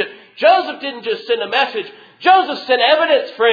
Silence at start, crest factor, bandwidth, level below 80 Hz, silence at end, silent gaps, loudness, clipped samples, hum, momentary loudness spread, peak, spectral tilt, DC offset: 0 s; 16 dB; 5 kHz; -64 dBFS; 0 s; none; -15 LUFS; under 0.1%; none; 12 LU; 0 dBFS; -4 dB/octave; under 0.1%